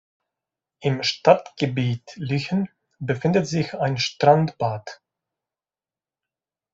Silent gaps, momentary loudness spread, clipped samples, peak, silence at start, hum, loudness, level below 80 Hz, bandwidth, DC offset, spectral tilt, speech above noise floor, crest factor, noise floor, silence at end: none; 12 LU; under 0.1%; -2 dBFS; 0.8 s; none; -22 LUFS; -62 dBFS; 7.8 kHz; under 0.1%; -6 dB/octave; over 68 dB; 22 dB; under -90 dBFS; 1.8 s